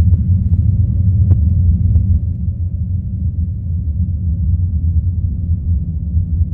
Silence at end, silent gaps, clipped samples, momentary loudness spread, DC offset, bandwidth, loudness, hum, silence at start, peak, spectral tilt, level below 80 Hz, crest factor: 0 s; none; under 0.1%; 7 LU; under 0.1%; 0.8 kHz; -16 LUFS; none; 0 s; -2 dBFS; -14.5 dB/octave; -20 dBFS; 12 dB